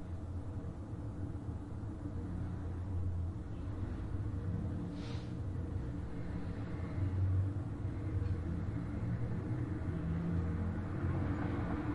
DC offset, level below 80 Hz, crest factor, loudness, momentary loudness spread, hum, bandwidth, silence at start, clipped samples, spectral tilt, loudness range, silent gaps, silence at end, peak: under 0.1%; -48 dBFS; 14 dB; -40 LUFS; 7 LU; none; 7 kHz; 0 s; under 0.1%; -9 dB/octave; 4 LU; none; 0 s; -24 dBFS